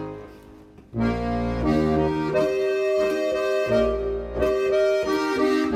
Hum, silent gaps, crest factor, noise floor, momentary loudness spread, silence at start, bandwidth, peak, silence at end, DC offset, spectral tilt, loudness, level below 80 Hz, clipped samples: none; none; 14 dB; -47 dBFS; 6 LU; 0 s; 14 kHz; -10 dBFS; 0 s; under 0.1%; -6.5 dB/octave; -23 LUFS; -38 dBFS; under 0.1%